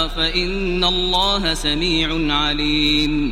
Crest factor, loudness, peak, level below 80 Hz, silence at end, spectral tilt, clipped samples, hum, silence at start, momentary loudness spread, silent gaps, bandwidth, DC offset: 16 dB; -17 LUFS; -4 dBFS; -28 dBFS; 0 s; -4 dB/octave; under 0.1%; none; 0 s; 3 LU; none; 15.5 kHz; under 0.1%